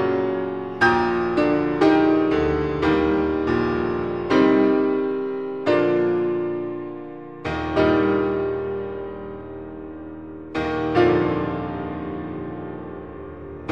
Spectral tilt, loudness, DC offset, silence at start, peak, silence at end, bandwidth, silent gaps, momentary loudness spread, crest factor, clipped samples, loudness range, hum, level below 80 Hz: -7.5 dB/octave; -21 LUFS; 0.3%; 0 s; -4 dBFS; 0 s; 7.2 kHz; none; 17 LU; 18 dB; under 0.1%; 5 LU; none; -44 dBFS